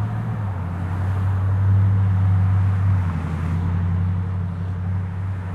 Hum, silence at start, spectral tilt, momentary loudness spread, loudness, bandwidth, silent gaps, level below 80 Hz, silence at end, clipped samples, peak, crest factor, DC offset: none; 0 s; -9.5 dB/octave; 8 LU; -22 LUFS; 3.8 kHz; none; -42 dBFS; 0 s; under 0.1%; -10 dBFS; 10 dB; under 0.1%